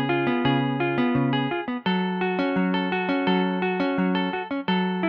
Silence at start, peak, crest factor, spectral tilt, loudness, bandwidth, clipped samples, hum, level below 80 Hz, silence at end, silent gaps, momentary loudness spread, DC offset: 0 s; -8 dBFS; 14 dB; -9 dB/octave; -24 LUFS; 5.4 kHz; under 0.1%; none; -58 dBFS; 0 s; none; 3 LU; under 0.1%